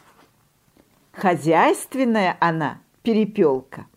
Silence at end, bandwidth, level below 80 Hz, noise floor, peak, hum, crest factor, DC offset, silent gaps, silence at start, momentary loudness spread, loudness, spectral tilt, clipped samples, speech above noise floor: 0.15 s; 16 kHz; -66 dBFS; -61 dBFS; -4 dBFS; none; 18 dB; under 0.1%; none; 1.15 s; 10 LU; -20 LUFS; -6 dB/octave; under 0.1%; 41 dB